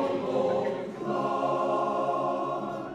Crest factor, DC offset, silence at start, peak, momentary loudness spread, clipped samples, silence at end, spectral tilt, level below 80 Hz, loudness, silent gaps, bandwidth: 14 dB; under 0.1%; 0 s; -16 dBFS; 5 LU; under 0.1%; 0 s; -7 dB/octave; -68 dBFS; -29 LUFS; none; 10.5 kHz